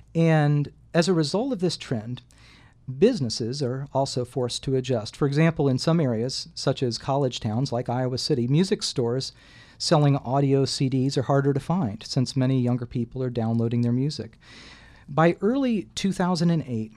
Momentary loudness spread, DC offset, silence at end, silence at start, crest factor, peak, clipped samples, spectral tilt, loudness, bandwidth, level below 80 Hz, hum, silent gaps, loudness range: 8 LU; under 0.1%; 0.1 s; 0.15 s; 18 dB; -6 dBFS; under 0.1%; -6 dB/octave; -24 LUFS; 12 kHz; -54 dBFS; none; none; 3 LU